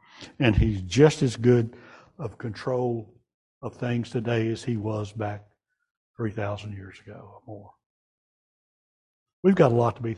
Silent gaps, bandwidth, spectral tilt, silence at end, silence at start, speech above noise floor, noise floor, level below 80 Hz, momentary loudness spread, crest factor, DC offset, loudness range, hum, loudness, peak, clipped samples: 3.34-3.61 s, 5.91-6.14 s, 7.86-9.26 s, 9.33-9.43 s; 11.5 kHz; -7 dB/octave; 0 s; 0.2 s; over 65 dB; under -90 dBFS; -42 dBFS; 24 LU; 22 dB; under 0.1%; 14 LU; none; -25 LUFS; -4 dBFS; under 0.1%